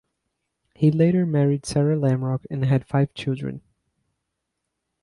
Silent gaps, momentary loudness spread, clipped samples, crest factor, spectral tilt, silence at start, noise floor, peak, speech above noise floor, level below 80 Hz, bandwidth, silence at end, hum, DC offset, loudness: none; 9 LU; under 0.1%; 16 dB; -8 dB/octave; 0.8 s; -80 dBFS; -8 dBFS; 59 dB; -56 dBFS; 11.5 kHz; 1.45 s; none; under 0.1%; -22 LUFS